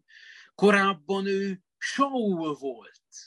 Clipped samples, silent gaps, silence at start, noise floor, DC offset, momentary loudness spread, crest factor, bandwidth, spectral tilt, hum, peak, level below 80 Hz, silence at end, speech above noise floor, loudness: under 0.1%; none; 0.3 s; -51 dBFS; under 0.1%; 14 LU; 20 dB; 11.5 kHz; -5 dB/octave; none; -8 dBFS; -74 dBFS; 0.05 s; 25 dB; -26 LUFS